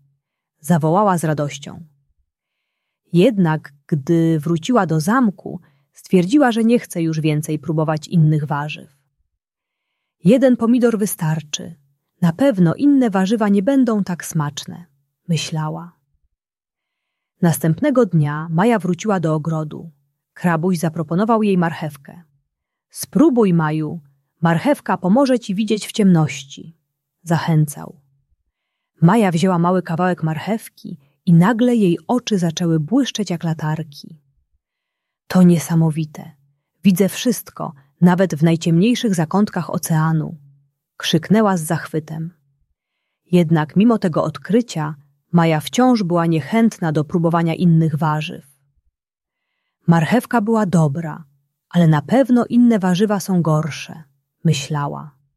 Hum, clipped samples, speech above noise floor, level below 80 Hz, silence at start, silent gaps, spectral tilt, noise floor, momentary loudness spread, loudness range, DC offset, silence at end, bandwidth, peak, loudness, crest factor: none; under 0.1%; 71 dB; -60 dBFS; 0.65 s; none; -6.5 dB/octave; -87 dBFS; 14 LU; 4 LU; under 0.1%; 0.25 s; 14 kHz; -2 dBFS; -17 LUFS; 16 dB